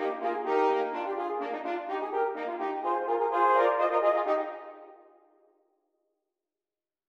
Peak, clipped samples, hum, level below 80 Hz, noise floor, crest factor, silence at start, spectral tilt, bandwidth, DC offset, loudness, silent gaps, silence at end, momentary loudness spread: -14 dBFS; under 0.1%; none; -84 dBFS; under -90 dBFS; 16 dB; 0 s; -4 dB/octave; 7.8 kHz; under 0.1%; -28 LUFS; none; 2.15 s; 9 LU